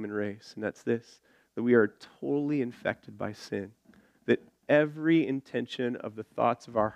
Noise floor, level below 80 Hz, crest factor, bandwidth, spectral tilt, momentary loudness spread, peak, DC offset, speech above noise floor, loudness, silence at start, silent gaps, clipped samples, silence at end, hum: -61 dBFS; -72 dBFS; 20 dB; 9.8 kHz; -7 dB/octave; 13 LU; -10 dBFS; under 0.1%; 31 dB; -30 LUFS; 0 s; none; under 0.1%; 0 s; none